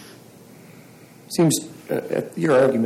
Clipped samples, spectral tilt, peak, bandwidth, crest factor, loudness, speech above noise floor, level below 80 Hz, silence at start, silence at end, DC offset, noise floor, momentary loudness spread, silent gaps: under 0.1%; -5 dB/octave; -8 dBFS; 16.5 kHz; 14 dB; -21 LUFS; 27 dB; -68 dBFS; 0 s; 0 s; under 0.1%; -46 dBFS; 11 LU; none